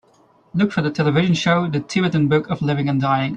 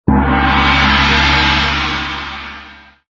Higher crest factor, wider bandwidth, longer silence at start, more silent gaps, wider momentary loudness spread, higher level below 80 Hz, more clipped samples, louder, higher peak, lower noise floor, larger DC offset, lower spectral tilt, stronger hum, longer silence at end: about the same, 14 dB vs 14 dB; first, 9 kHz vs 7.6 kHz; first, 0.55 s vs 0.05 s; neither; second, 4 LU vs 16 LU; second, -54 dBFS vs -22 dBFS; neither; second, -19 LUFS vs -12 LUFS; second, -4 dBFS vs 0 dBFS; first, -55 dBFS vs -38 dBFS; neither; first, -6.5 dB/octave vs -2.5 dB/octave; neither; second, 0 s vs 0.35 s